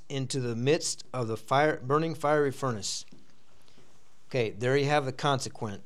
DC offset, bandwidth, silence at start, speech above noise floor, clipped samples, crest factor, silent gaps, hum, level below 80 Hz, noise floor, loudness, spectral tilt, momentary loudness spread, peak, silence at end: 0.8%; 14 kHz; 0.1 s; 34 dB; under 0.1%; 18 dB; none; none; -74 dBFS; -63 dBFS; -29 LUFS; -4.5 dB/octave; 8 LU; -12 dBFS; 0.05 s